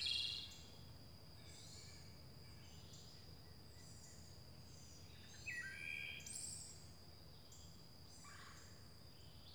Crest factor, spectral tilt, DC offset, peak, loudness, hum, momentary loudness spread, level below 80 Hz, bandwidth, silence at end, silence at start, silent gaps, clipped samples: 22 dB; -1.5 dB/octave; under 0.1%; -30 dBFS; -53 LUFS; none; 13 LU; -68 dBFS; over 20 kHz; 0 s; 0 s; none; under 0.1%